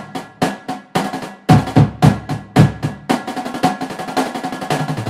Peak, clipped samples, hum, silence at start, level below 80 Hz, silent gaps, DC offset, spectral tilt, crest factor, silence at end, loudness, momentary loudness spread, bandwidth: 0 dBFS; 0.2%; none; 0 s; -40 dBFS; none; under 0.1%; -6.5 dB/octave; 18 dB; 0 s; -17 LUFS; 12 LU; 15.5 kHz